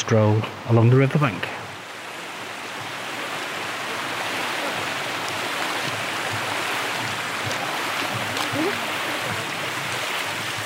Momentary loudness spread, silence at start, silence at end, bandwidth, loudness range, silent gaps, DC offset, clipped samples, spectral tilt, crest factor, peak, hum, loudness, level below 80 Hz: 12 LU; 0 s; 0 s; 16 kHz; 4 LU; none; under 0.1%; under 0.1%; -4.5 dB/octave; 20 dB; -6 dBFS; none; -24 LUFS; -66 dBFS